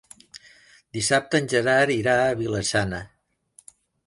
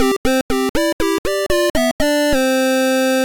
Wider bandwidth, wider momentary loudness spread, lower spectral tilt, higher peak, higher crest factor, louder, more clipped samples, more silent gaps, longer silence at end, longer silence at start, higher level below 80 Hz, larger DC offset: second, 11.5 kHz vs 19.5 kHz; first, 14 LU vs 3 LU; about the same, -4 dB/octave vs -3.5 dB/octave; about the same, -6 dBFS vs -6 dBFS; first, 20 dB vs 10 dB; second, -22 LUFS vs -17 LUFS; neither; second, none vs 0.17-0.24 s, 0.41-0.49 s, 0.69-0.74 s, 0.93-0.99 s, 1.18-1.24 s, 1.70-1.74 s, 1.91-1.99 s; first, 1 s vs 0 s; first, 0.35 s vs 0 s; second, -52 dBFS vs -34 dBFS; second, under 0.1% vs 3%